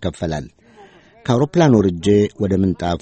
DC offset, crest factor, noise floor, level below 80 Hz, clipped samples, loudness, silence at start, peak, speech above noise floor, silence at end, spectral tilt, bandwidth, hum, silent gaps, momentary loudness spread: under 0.1%; 16 dB; -46 dBFS; -42 dBFS; under 0.1%; -17 LUFS; 0 s; -2 dBFS; 30 dB; 0.05 s; -7 dB/octave; 8.8 kHz; none; none; 12 LU